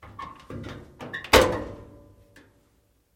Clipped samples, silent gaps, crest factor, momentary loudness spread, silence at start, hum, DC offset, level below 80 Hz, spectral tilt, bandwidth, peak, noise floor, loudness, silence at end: under 0.1%; none; 26 dB; 22 LU; 0.05 s; none; under 0.1%; -42 dBFS; -3.5 dB/octave; 16.5 kHz; -2 dBFS; -65 dBFS; -21 LUFS; 1.3 s